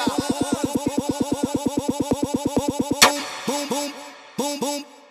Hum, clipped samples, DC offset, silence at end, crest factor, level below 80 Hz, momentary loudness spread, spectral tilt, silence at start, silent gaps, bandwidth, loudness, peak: none; under 0.1%; under 0.1%; 0.1 s; 24 dB; -50 dBFS; 12 LU; -3 dB/octave; 0 s; none; 15.5 kHz; -23 LUFS; 0 dBFS